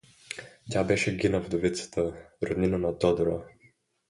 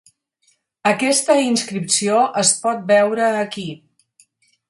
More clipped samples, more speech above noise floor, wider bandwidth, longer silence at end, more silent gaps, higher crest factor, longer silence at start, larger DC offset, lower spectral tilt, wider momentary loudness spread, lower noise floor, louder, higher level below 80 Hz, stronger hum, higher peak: neither; second, 37 dB vs 46 dB; about the same, 11.5 kHz vs 11.5 kHz; second, 0.6 s vs 0.95 s; neither; about the same, 20 dB vs 18 dB; second, 0.3 s vs 0.85 s; neither; first, -5.5 dB/octave vs -2.5 dB/octave; first, 14 LU vs 8 LU; about the same, -64 dBFS vs -63 dBFS; second, -28 LUFS vs -17 LUFS; first, -50 dBFS vs -68 dBFS; neither; second, -10 dBFS vs 0 dBFS